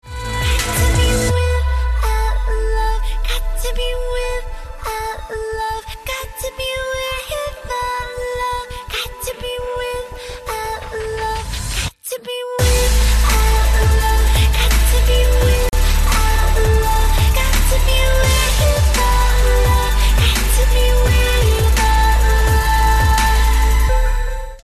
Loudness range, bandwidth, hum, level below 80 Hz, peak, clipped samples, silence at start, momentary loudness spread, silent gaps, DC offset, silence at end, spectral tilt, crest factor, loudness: 9 LU; 14 kHz; none; -16 dBFS; -4 dBFS; under 0.1%; 0.05 s; 10 LU; none; under 0.1%; 0.05 s; -4 dB/octave; 10 dB; -17 LUFS